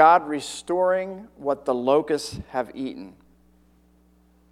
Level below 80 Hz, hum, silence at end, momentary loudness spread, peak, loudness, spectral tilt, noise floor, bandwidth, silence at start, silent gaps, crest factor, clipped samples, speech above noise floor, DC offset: -56 dBFS; none; 1.4 s; 13 LU; -2 dBFS; -24 LUFS; -4.5 dB/octave; -58 dBFS; 14 kHz; 0 s; none; 22 dB; under 0.1%; 36 dB; under 0.1%